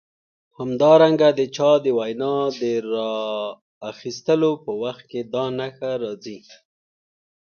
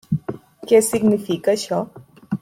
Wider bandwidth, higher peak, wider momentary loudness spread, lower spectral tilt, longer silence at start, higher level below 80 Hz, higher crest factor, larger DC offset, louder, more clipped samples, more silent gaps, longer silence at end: second, 6.8 kHz vs 16 kHz; about the same, -4 dBFS vs -4 dBFS; about the same, 17 LU vs 18 LU; about the same, -6 dB/octave vs -5.5 dB/octave; first, 0.6 s vs 0.1 s; second, -70 dBFS vs -56 dBFS; about the same, 18 dB vs 16 dB; neither; about the same, -21 LUFS vs -19 LUFS; neither; first, 3.61-3.81 s vs none; first, 1.2 s vs 0.05 s